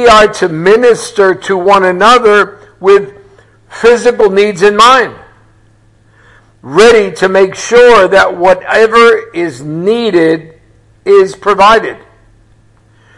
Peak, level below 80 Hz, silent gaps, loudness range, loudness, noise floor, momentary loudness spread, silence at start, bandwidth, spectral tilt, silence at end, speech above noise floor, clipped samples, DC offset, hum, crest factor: 0 dBFS; -40 dBFS; none; 3 LU; -7 LUFS; -45 dBFS; 10 LU; 0 s; 12 kHz; -4 dB/octave; 1.2 s; 39 dB; 1%; under 0.1%; none; 8 dB